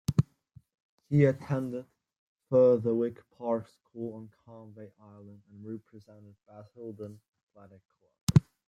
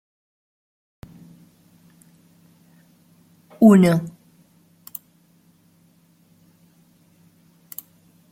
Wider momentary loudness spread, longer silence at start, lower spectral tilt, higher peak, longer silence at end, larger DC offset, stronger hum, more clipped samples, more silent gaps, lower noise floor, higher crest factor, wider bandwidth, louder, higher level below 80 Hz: about the same, 26 LU vs 25 LU; second, 0.1 s vs 3.6 s; about the same, -8 dB/octave vs -8 dB/octave; second, -6 dBFS vs -2 dBFS; second, 0.3 s vs 4.25 s; neither; neither; neither; first, 0.80-0.98 s, 2.18-2.36 s, 7.28-7.33 s, 7.43-7.47 s, 8.21-8.27 s vs none; about the same, -60 dBFS vs -58 dBFS; about the same, 24 dB vs 22 dB; about the same, 15 kHz vs 16.5 kHz; second, -29 LUFS vs -15 LUFS; about the same, -60 dBFS vs -64 dBFS